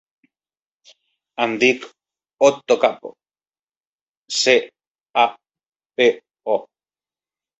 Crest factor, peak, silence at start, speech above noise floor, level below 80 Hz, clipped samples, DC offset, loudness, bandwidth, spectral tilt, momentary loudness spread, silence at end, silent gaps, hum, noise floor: 22 dB; -2 dBFS; 1.4 s; over 72 dB; -68 dBFS; under 0.1%; under 0.1%; -19 LUFS; 8.2 kHz; -2.5 dB/octave; 19 LU; 0.95 s; 3.59-3.67 s, 3.77-3.81 s, 3.87-4.23 s, 4.87-4.95 s, 5.01-5.14 s, 5.68-5.72 s; none; under -90 dBFS